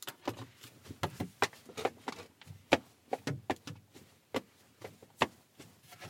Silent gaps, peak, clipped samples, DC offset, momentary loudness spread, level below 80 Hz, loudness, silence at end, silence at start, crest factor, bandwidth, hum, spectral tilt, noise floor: none; -6 dBFS; under 0.1%; under 0.1%; 23 LU; -68 dBFS; -38 LUFS; 0 s; 0 s; 34 dB; 16.5 kHz; none; -4 dB/octave; -60 dBFS